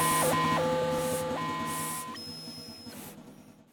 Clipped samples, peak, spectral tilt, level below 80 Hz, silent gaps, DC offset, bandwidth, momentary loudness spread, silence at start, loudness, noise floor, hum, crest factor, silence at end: under 0.1%; -16 dBFS; -3.5 dB/octave; -60 dBFS; none; under 0.1%; over 20 kHz; 18 LU; 0 s; -30 LUFS; -53 dBFS; none; 14 dB; 0.1 s